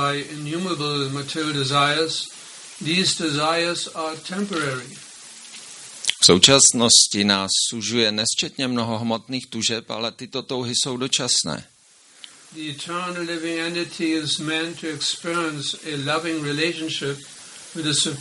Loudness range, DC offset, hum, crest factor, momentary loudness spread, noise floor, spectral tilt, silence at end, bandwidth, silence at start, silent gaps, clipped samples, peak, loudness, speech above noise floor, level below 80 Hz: 10 LU; under 0.1%; none; 22 dB; 20 LU; -52 dBFS; -2.5 dB/octave; 0 s; 11.5 kHz; 0 s; none; under 0.1%; 0 dBFS; -20 LUFS; 30 dB; -62 dBFS